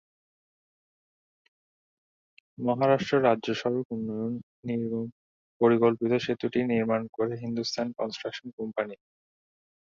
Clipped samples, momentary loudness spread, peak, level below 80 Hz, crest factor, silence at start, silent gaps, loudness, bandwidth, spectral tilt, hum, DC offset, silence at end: under 0.1%; 11 LU; -8 dBFS; -70 dBFS; 22 dB; 2.6 s; 3.85-3.90 s, 4.43-4.63 s, 5.12-5.60 s, 7.09-7.13 s, 8.53-8.58 s; -28 LUFS; 7.4 kHz; -6.5 dB/octave; none; under 0.1%; 1.05 s